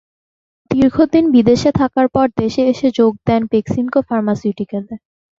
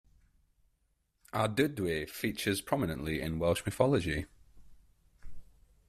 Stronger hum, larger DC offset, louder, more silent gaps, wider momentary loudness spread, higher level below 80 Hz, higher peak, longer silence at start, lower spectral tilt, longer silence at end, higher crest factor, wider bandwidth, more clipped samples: neither; neither; first, -15 LUFS vs -32 LUFS; neither; first, 11 LU vs 7 LU; first, -44 dBFS vs -54 dBFS; first, -2 dBFS vs -12 dBFS; second, 0.7 s vs 1.35 s; first, -7 dB/octave vs -5.5 dB/octave; about the same, 0.4 s vs 0.45 s; second, 14 dB vs 24 dB; second, 7.6 kHz vs 16 kHz; neither